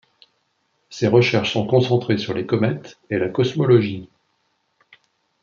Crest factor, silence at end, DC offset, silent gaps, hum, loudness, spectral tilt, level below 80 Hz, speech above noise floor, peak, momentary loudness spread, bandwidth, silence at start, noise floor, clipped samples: 18 dB; 1.35 s; under 0.1%; none; none; -19 LUFS; -7 dB/octave; -62 dBFS; 50 dB; -2 dBFS; 11 LU; 7.2 kHz; 0.9 s; -69 dBFS; under 0.1%